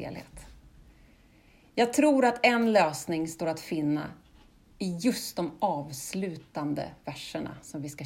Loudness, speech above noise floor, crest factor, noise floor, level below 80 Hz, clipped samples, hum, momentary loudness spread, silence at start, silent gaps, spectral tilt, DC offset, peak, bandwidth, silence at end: -29 LUFS; 30 dB; 22 dB; -59 dBFS; -60 dBFS; under 0.1%; none; 16 LU; 0 s; none; -4.5 dB/octave; under 0.1%; -8 dBFS; 16 kHz; 0 s